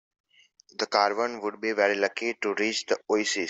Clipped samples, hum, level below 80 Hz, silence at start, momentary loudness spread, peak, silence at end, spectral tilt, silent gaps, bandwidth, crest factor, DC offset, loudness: under 0.1%; none; -76 dBFS; 0.8 s; 7 LU; -8 dBFS; 0 s; -2 dB/octave; none; 8.2 kHz; 20 dB; under 0.1%; -27 LUFS